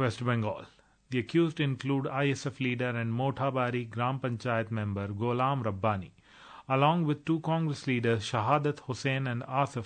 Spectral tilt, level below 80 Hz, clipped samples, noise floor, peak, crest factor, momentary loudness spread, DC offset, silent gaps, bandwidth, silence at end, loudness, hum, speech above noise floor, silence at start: -6.5 dB/octave; -68 dBFS; under 0.1%; -53 dBFS; -10 dBFS; 20 dB; 6 LU; under 0.1%; none; 9.4 kHz; 0 s; -30 LUFS; none; 23 dB; 0 s